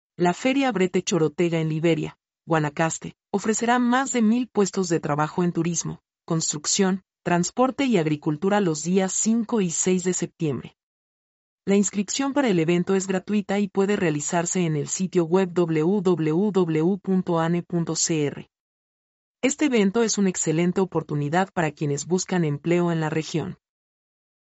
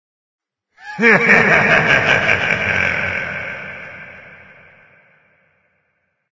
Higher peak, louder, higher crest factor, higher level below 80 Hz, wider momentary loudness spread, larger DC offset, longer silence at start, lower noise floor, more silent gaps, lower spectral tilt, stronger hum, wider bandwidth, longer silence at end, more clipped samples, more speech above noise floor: second, -8 dBFS vs 0 dBFS; second, -23 LUFS vs -13 LUFS; about the same, 16 dB vs 18 dB; second, -64 dBFS vs -46 dBFS; second, 6 LU vs 22 LU; neither; second, 0.2 s vs 0.85 s; first, under -90 dBFS vs -68 dBFS; first, 10.83-11.58 s, 18.60-19.35 s vs none; about the same, -5 dB/octave vs -5 dB/octave; neither; about the same, 8.2 kHz vs 8 kHz; second, 0.9 s vs 2 s; neither; first, over 67 dB vs 55 dB